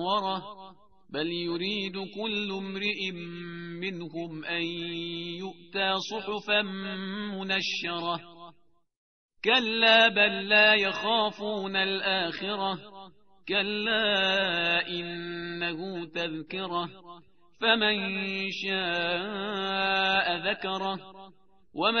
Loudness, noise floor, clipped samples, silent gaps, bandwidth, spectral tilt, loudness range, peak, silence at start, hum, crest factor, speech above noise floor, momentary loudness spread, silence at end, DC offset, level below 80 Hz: -27 LUFS; -59 dBFS; under 0.1%; 8.97-9.29 s; 6.6 kHz; -1 dB/octave; 9 LU; -8 dBFS; 0 s; none; 22 dB; 30 dB; 14 LU; 0 s; 0.1%; -68 dBFS